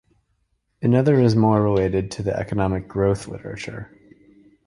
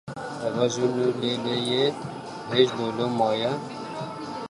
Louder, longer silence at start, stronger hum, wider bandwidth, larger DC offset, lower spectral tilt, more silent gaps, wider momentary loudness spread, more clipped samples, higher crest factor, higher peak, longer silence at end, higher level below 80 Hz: first, -20 LUFS vs -26 LUFS; first, 0.8 s vs 0.05 s; neither; about the same, 11 kHz vs 11.5 kHz; neither; first, -8 dB/octave vs -5 dB/octave; neither; first, 16 LU vs 12 LU; neither; about the same, 18 dB vs 20 dB; about the same, -4 dBFS vs -6 dBFS; first, 0.85 s vs 0 s; first, -44 dBFS vs -66 dBFS